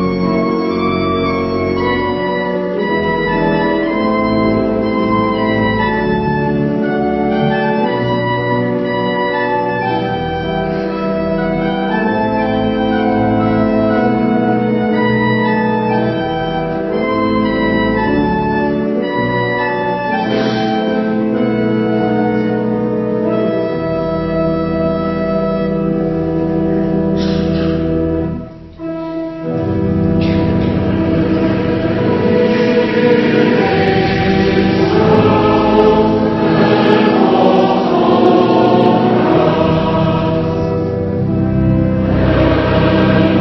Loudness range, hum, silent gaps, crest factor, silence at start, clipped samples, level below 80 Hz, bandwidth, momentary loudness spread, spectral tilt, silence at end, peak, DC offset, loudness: 5 LU; none; none; 14 dB; 0 s; under 0.1%; -34 dBFS; 6.2 kHz; 6 LU; -8.5 dB/octave; 0 s; 0 dBFS; under 0.1%; -14 LUFS